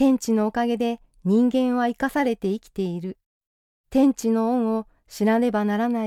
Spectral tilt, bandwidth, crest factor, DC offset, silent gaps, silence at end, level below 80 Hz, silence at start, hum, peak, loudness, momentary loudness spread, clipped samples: -6 dB/octave; 15.5 kHz; 14 dB; under 0.1%; 3.26-3.41 s, 3.47-3.84 s; 0 s; -56 dBFS; 0 s; none; -8 dBFS; -23 LUFS; 9 LU; under 0.1%